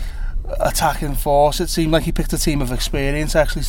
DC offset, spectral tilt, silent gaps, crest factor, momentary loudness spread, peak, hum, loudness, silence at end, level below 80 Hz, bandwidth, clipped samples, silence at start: under 0.1%; -4.5 dB/octave; none; 16 dB; 7 LU; -2 dBFS; none; -19 LUFS; 0 s; -24 dBFS; 18 kHz; under 0.1%; 0 s